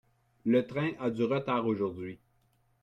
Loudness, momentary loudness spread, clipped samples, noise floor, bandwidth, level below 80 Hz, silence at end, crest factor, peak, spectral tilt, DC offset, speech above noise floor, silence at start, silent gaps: -31 LUFS; 10 LU; under 0.1%; -70 dBFS; 7.6 kHz; -70 dBFS; 0.65 s; 16 dB; -16 dBFS; -8.5 dB/octave; under 0.1%; 40 dB; 0.45 s; none